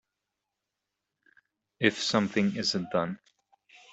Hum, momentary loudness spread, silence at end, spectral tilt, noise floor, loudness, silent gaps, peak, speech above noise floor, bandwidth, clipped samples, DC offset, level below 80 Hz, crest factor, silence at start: none; 7 LU; 0.75 s; -4.5 dB/octave; -86 dBFS; -28 LUFS; none; -8 dBFS; 58 dB; 8.2 kHz; under 0.1%; under 0.1%; -70 dBFS; 24 dB; 1.8 s